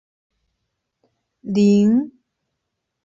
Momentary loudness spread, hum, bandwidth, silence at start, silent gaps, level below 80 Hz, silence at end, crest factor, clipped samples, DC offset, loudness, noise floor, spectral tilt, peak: 20 LU; none; 7.6 kHz; 1.45 s; none; -62 dBFS; 0.95 s; 16 dB; under 0.1%; under 0.1%; -17 LUFS; -78 dBFS; -8 dB/octave; -6 dBFS